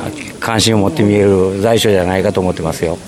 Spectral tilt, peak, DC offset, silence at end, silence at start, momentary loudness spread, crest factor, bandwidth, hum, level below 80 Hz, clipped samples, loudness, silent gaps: -5 dB/octave; 0 dBFS; under 0.1%; 0 s; 0 s; 7 LU; 14 dB; 16 kHz; none; -40 dBFS; under 0.1%; -13 LUFS; none